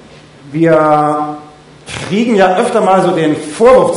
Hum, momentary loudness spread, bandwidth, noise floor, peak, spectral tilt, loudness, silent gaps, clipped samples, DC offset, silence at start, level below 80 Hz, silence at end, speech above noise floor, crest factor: none; 15 LU; 11 kHz; -34 dBFS; 0 dBFS; -6 dB/octave; -11 LUFS; none; under 0.1%; under 0.1%; 0.45 s; -46 dBFS; 0 s; 24 dB; 12 dB